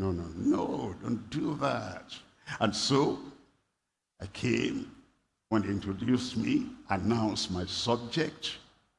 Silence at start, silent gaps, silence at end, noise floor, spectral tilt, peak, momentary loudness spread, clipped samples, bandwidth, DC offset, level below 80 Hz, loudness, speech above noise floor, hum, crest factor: 0 s; none; 0.35 s; -84 dBFS; -5 dB/octave; -12 dBFS; 15 LU; under 0.1%; 11.5 kHz; under 0.1%; -62 dBFS; -31 LUFS; 53 dB; none; 20 dB